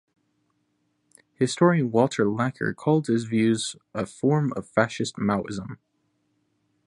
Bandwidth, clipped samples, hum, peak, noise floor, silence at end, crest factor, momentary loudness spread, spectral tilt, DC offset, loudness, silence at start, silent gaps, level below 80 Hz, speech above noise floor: 11.5 kHz; under 0.1%; none; -4 dBFS; -72 dBFS; 1.1 s; 22 dB; 11 LU; -6 dB/octave; under 0.1%; -24 LUFS; 1.4 s; none; -62 dBFS; 48 dB